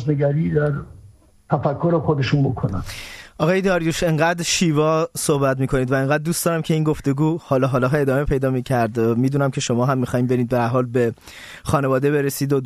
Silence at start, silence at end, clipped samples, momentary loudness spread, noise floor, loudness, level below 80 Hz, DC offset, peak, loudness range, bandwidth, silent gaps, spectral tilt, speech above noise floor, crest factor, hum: 0 s; 0 s; under 0.1%; 6 LU; -48 dBFS; -20 LUFS; -42 dBFS; under 0.1%; -4 dBFS; 2 LU; 14 kHz; none; -6 dB/octave; 29 dB; 14 dB; none